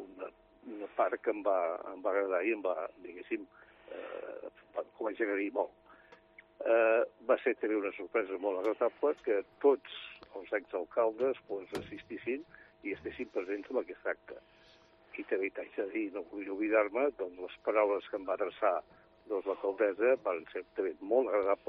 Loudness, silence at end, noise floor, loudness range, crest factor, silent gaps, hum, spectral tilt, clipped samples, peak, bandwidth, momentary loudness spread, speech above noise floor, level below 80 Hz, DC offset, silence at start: -34 LUFS; 0.1 s; -62 dBFS; 7 LU; 20 dB; none; none; -2.5 dB/octave; under 0.1%; -14 dBFS; 6.4 kHz; 15 LU; 28 dB; -74 dBFS; under 0.1%; 0 s